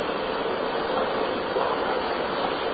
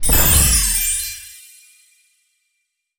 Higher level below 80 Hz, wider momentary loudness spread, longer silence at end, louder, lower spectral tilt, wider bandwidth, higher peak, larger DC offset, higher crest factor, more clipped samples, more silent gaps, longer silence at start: second, -54 dBFS vs -26 dBFS; second, 2 LU vs 20 LU; second, 0 s vs 1.65 s; second, -26 LUFS vs -14 LUFS; first, -8.5 dB/octave vs -2 dB/octave; second, 5 kHz vs over 20 kHz; second, -12 dBFS vs 0 dBFS; neither; about the same, 14 dB vs 18 dB; neither; neither; about the same, 0 s vs 0 s